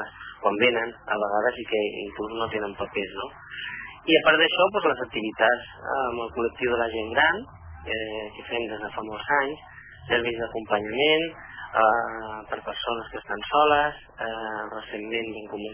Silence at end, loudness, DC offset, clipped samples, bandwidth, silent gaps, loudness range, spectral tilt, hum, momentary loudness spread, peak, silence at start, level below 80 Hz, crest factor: 0 s; -25 LUFS; under 0.1%; under 0.1%; 3.5 kHz; none; 4 LU; -7.5 dB/octave; none; 14 LU; -4 dBFS; 0 s; -54 dBFS; 22 dB